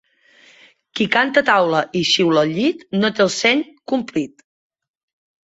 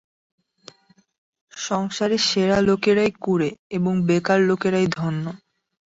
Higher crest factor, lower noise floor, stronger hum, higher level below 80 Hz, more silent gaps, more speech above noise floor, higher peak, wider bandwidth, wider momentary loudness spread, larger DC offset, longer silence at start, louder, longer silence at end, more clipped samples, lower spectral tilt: about the same, 18 dB vs 16 dB; about the same, -52 dBFS vs -50 dBFS; neither; second, -64 dBFS vs -54 dBFS; second, none vs 3.59-3.70 s; first, 34 dB vs 29 dB; first, -2 dBFS vs -6 dBFS; about the same, 8 kHz vs 8 kHz; about the same, 9 LU vs 8 LU; neither; second, 0.95 s vs 1.55 s; first, -17 LUFS vs -21 LUFS; first, 1.2 s vs 0.55 s; neither; second, -4 dB/octave vs -5.5 dB/octave